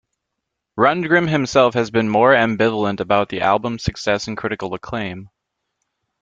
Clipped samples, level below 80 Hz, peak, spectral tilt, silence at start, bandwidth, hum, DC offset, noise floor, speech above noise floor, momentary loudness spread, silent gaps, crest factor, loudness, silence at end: under 0.1%; -48 dBFS; -2 dBFS; -5.5 dB/octave; 0.75 s; 7.8 kHz; none; under 0.1%; -79 dBFS; 61 dB; 12 LU; none; 18 dB; -18 LUFS; 0.95 s